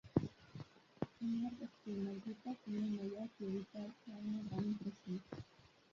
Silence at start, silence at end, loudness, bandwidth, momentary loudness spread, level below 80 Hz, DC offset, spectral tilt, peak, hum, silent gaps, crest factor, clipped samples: 0.05 s; 0.25 s; -45 LUFS; 7.2 kHz; 13 LU; -70 dBFS; under 0.1%; -8 dB/octave; -20 dBFS; none; none; 24 dB; under 0.1%